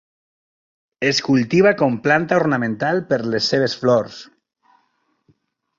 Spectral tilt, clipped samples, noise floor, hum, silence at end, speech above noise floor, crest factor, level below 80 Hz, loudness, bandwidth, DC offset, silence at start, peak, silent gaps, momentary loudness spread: -5.5 dB/octave; under 0.1%; -66 dBFS; none; 1.55 s; 49 dB; 18 dB; -60 dBFS; -18 LUFS; 7.6 kHz; under 0.1%; 1 s; -2 dBFS; none; 6 LU